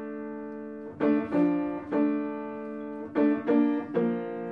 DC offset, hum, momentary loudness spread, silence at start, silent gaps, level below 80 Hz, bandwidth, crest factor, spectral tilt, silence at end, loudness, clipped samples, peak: under 0.1%; none; 13 LU; 0 s; none; -70 dBFS; 4.5 kHz; 16 dB; -9.5 dB/octave; 0 s; -28 LUFS; under 0.1%; -12 dBFS